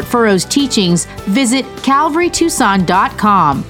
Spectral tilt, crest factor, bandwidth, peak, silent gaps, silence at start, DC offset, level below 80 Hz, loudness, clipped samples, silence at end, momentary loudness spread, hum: -4 dB/octave; 12 dB; 17 kHz; 0 dBFS; none; 0 s; under 0.1%; -38 dBFS; -12 LUFS; under 0.1%; 0 s; 4 LU; none